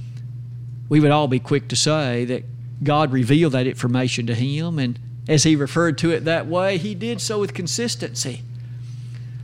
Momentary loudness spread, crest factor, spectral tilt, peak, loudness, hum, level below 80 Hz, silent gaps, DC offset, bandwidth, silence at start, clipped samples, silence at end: 17 LU; 16 dB; -5 dB/octave; -4 dBFS; -20 LUFS; none; -54 dBFS; none; under 0.1%; 15.5 kHz; 0 s; under 0.1%; 0 s